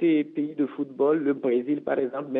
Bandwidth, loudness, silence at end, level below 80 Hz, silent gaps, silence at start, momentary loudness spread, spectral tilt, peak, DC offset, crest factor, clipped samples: 3.9 kHz; -26 LUFS; 0 s; -74 dBFS; none; 0 s; 6 LU; -10 dB/octave; -12 dBFS; under 0.1%; 14 dB; under 0.1%